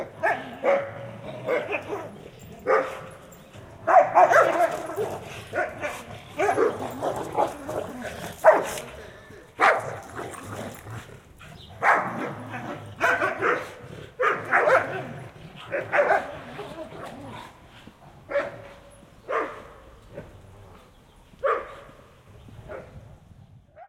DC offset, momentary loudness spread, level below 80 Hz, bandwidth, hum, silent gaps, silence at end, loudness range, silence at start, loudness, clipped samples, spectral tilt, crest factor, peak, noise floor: under 0.1%; 24 LU; -58 dBFS; 16.5 kHz; none; none; 0.05 s; 12 LU; 0 s; -25 LUFS; under 0.1%; -4.5 dB/octave; 24 dB; -4 dBFS; -53 dBFS